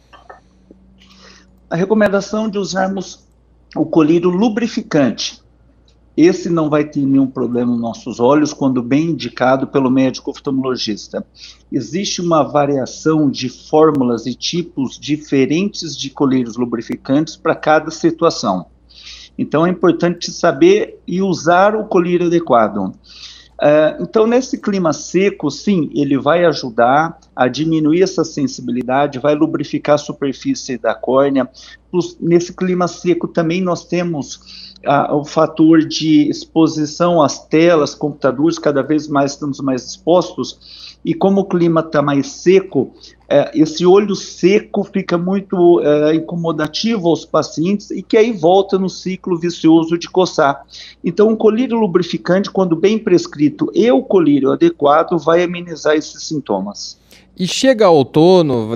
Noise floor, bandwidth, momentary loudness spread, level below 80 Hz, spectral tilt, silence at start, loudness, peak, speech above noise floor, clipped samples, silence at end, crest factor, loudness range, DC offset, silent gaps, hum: -50 dBFS; 9 kHz; 10 LU; -52 dBFS; -6 dB/octave; 0.15 s; -15 LUFS; 0 dBFS; 35 dB; under 0.1%; 0 s; 14 dB; 4 LU; under 0.1%; none; none